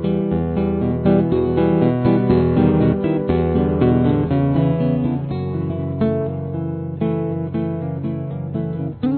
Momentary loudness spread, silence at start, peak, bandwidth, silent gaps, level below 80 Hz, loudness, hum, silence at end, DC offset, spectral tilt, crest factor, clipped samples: 9 LU; 0 s; -2 dBFS; 4.5 kHz; none; -36 dBFS; -19 LUFS; none; 0 s; under 0.1%; -13 dB/octave; 16 dB; under 0.1%